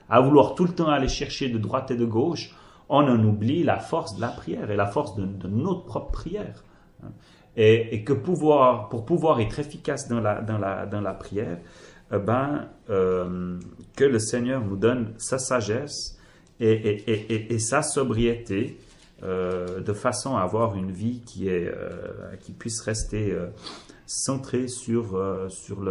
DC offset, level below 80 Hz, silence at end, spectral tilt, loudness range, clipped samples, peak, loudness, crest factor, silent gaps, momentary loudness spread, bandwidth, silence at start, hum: under 0.1%; -46 dBFS; 0 s; -5.5 dB/octave; 6 LU; under 0.1%; -4 dBFS; -25 LUFS; 22 dB; none; 14 LU; 11.5 kHz; 0.1 s; none